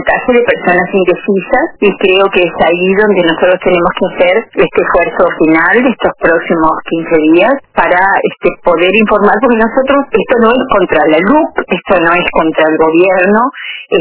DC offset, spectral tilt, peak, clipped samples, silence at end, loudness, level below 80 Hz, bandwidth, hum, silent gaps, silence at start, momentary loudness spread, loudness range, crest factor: under 0.1%; -9 dB/octave; 0 dBFS; 0.6%; 0 s; -9 LUFS; -38 dBFS; 4 kHz; none; none; 0 s; 4 LU; 1 LU; 8 dB